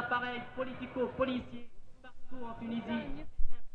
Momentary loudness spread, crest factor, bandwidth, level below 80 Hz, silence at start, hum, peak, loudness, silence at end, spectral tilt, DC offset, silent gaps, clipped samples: 18 LU; 18 dB; 4.3 kHz; -44 dBFS; 0 s; none; -14 dBFS; -38 LUFS; 0 s; -7.5 dB/octave; under 0.1%; none; under 0.1%